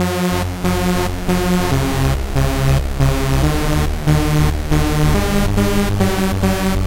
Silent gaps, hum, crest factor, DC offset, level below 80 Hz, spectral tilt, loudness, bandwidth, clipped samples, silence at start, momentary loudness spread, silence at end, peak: none; none; 12 dB; 0.6%; -22 dBFS; -6 dB/octave; -17 LUFS; 17 kHz; under 0.1%; 0 s; 3 LU; 0 s; -4 dBFS